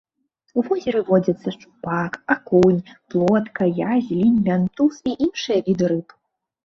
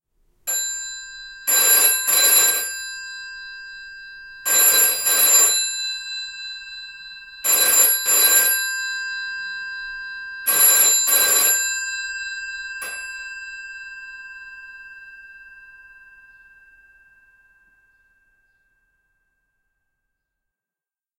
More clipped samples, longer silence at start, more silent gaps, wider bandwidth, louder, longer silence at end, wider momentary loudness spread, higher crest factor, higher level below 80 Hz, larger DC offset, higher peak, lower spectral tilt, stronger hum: neither; about the same, 0.55 s vs 0.45 s; neither; second, 7.2 kHz vs 16 kHz; second, -20 LUFS vs -16 LUFS; second, 0.65 s vs 5.55 s; second, 9 LU vs 23 LU; about the same, 16 dB vs 20 dB; first, -56 dBFS vs -62 dBFS; neither; about the same, -4 dBFS vs -2 dBFS; first, -7.5 dB/octave vs 3 dB/octave; neither